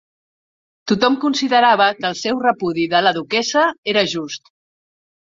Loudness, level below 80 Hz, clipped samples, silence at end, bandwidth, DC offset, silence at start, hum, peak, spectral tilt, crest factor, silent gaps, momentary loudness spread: -17 LUFS; -62 dBFS; under 0.1%; 1 s; 7.8 kHz; under 0.1%; 0.85 s; none; 0 dBFS; -3.5 dB/octave; 18 dB; 3.78-3.83 s; 9 LU